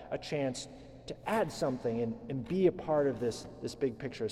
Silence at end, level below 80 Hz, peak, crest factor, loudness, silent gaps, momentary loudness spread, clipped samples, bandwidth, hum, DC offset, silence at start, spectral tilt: 0 s; -60 dBFS; -16 dBFS; 18 dB; -34 LUFS; none; 13 LU; under 0.1%; 14 kHz; none; under 0.1%; 0 s; -6 dB/octave